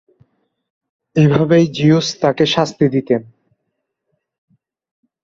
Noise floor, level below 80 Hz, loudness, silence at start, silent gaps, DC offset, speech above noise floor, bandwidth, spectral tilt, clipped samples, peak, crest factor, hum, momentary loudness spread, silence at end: -74 dBFS; -54 dBFS; -15 LUFS; 1.15 s; none; under 0.1%; 60 dB; 7.6 kHz; -6.5 dB/octave; under 0.1%; -2 dBFS; 16 dB; none; 7 LU; 2 s